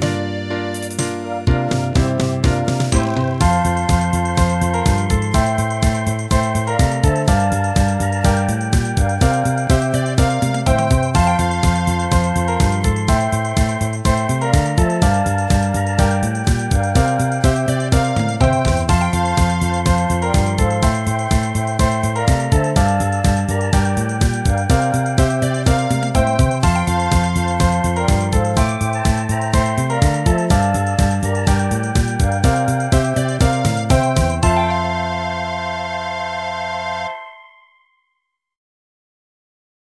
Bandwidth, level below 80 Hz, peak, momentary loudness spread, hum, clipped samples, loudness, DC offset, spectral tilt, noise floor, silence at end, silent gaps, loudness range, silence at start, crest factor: 11 kHz; -24 dBFS; 0 dBFS; 5 LU; none; under 0.1%; -17 LUFS; 0.1%; -5.5 dB/octave; -73 dBFS; 2.45 s; none; 2 LU; 0 s; 16 dB